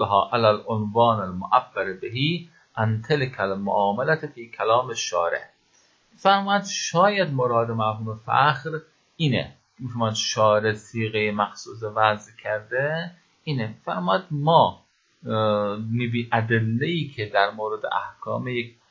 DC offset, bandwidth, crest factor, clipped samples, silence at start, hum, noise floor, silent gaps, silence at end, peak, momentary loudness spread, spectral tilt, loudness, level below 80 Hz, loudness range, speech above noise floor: under 0.1%; 7.8 kHz; 22 dB; under 0.1%; 0 s; none; -61 dBFS; none; 0.2 s; -2 dBFS; 11 LU; -5 dB/octave; -23 LUFS; -60 dBFS; 3 LU; 38 dB